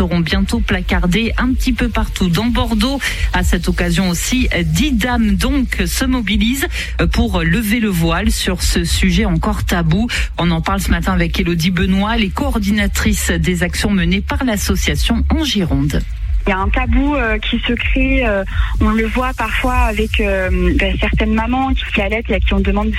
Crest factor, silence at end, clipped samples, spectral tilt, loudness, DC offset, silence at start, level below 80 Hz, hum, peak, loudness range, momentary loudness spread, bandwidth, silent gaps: 14 dB; 0 s; under 0.1%; -5 dB/octave; -16 LUFS; under 0.1%; 0 s; -20 dBFS; none; -2 dBFS; 1 LU; 2 LU; 15 kHz; none